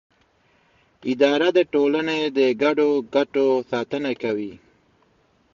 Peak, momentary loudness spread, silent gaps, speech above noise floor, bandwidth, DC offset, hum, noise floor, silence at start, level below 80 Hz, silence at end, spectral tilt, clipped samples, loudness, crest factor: -6 dBFS; 9 LU; none; 41 dB; 7.4 kHz; under 0.1%; none; -62 dBFS; 1.05 s; -66 dBFS; 0.95 s; -5.5 dB/octave; under 0.1%; -21 LUFS; 16 dB